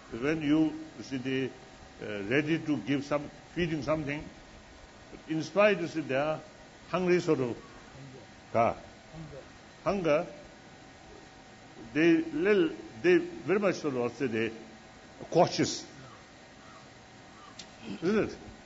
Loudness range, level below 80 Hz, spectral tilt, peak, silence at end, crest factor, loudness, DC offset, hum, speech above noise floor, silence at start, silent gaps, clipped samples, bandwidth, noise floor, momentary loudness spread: 5 LU; -60 dBFS; -5.5 dB/octave; -12 dBFS; 0 s; 20 dB; -30 LUFS; under 0.1%; none; 23 dB; 0 s; none; under 0.1%; 8 kHz; -52 dBFS; 25 LU